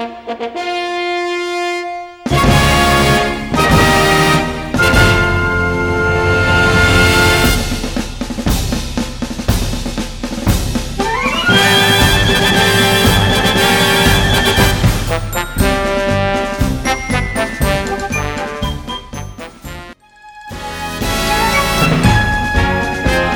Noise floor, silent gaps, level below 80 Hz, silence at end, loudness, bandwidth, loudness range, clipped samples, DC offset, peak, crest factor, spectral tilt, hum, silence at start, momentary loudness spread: -39 dBFS; none; -24 dBFS; 0 s; -13 LUFS; 17.5 kHz; 8 LU; under 0.1%; under 0.1%; 0 dBFS; 14 dB; -4 dB/octave; none; 0 s; 13 LU